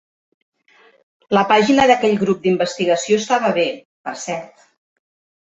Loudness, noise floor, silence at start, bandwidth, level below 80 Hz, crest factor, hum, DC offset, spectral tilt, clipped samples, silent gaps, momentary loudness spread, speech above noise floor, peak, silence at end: -17 LUFS; -53 dBFS; 1.3 s; 8.2 kHz; -58 dBFS; 18 dB; none; under 0.1%; -4.5 dB/octave; under 0.1%; 3.85-4.04 s; 15 LU; 37 dB; -2 dBFS; 0.95 s